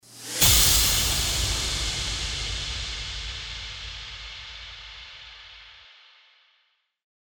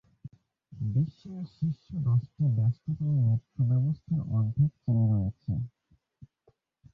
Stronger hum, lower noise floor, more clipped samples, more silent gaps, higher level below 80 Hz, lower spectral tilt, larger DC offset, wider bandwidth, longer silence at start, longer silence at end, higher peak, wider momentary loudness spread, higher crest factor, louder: neither; about the same, -69 dBFS vs -69 dBFS; neither; neither; first, -36 dBFS vs -52 dBFS; second, -1 dB/octave vs -12.5 dB/octave; neither; first, over 20 kHz vs 4.6 kHz; second, 0.1 s vs 0.25 s; first, 1.35 s vs 0.7 s; first, -4 dBFS vs -16 dBFS; first, 24 LU vs 8 LU; first, 24 dB vs 14 dB; first, -22 LUFS vs -29 LUFS